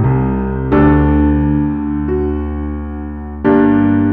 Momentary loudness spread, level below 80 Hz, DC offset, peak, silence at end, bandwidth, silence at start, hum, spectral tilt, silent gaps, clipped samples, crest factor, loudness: 12 LU; -22 dBFS; under 0.1%; 0 dBFS; 0 s; 3.8 kHz; 0 s; none; -12 dB/octave; none; under 0.1%; 12 dB; -14 LUFS